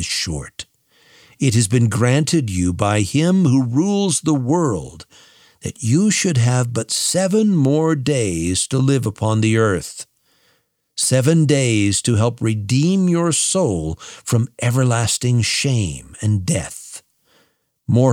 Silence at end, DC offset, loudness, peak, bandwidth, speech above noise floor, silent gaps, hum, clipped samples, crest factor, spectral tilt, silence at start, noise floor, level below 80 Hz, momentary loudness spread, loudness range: 0 s; under 0.1%; -17 LUFS; 0 dBFS; 16 kHz; 46 dB; none; none; under 0.1%; 18 dB; -5 dB/octave; 0 s; -63 dBFS; -46 dBFS; 13 LU; 3 LU